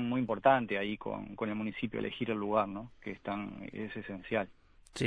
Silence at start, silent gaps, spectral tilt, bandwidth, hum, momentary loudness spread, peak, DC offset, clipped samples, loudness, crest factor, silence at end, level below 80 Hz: 0 s; none; -6.5 dB/octave; 10 kHz; none; 14 LU; -12 dBFS; under 0.1%; under 0.1%; -35 LUFS; 22 dB; 0 s; -62 dBFS